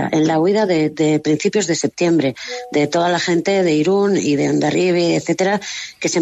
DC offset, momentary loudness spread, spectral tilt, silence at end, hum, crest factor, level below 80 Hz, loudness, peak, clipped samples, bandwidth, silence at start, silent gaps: under 0.1%; 5 LU; -5 dB/octave; 0 s; none; 12 dB; -60 dBFS; -17 LUFS; -4 dBFS; under 0.1%; 8.6 kHz; 0 s; none